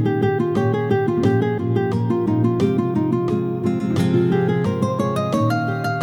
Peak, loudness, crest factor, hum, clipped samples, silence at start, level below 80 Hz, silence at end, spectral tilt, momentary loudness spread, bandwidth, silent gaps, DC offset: -6 dBFS; -20 LUFS; 14 dB; none; under 0.1%; 0 s; -52 dBFS; 0 s; -8 dB/octave; 3 LU; 18.5 kHz; none; under 0.1%